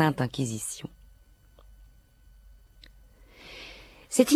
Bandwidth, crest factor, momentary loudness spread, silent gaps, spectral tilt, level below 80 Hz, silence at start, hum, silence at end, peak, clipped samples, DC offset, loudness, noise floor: 14.5 kHz; 24 dB; 29 LU; none; -4.5 dB/octave; -56 dBFS; 0 s; none; 0 s; -6 dBFS; under 0.1%; under 0.1%; -31 LUFS; -57 dBFS